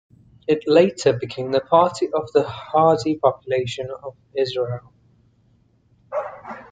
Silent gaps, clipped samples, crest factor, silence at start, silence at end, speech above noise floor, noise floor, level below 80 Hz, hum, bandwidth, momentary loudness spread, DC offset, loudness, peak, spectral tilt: none; under 0.1%; 20 dB; 0.5 s; 0.1 s; 39 dB; -59 dBFS; -60 dBFS; none; 9.4 kHz; 15 LU; under 0.1%; -21 LUFS; -2 dBFS; -6 dB/octave